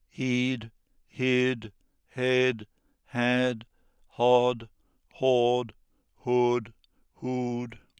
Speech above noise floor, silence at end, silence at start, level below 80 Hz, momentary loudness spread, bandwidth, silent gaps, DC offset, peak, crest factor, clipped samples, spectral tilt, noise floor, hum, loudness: 35 dB; 0.2 s; 0.2 s; -64 dBFS; 16 LU; 9.6 kHz; none; under 0.1%; -8 dBFS; 20 dB; under 0.1%; -6 dB/octave; -61 dBFS; none; -27 LUFS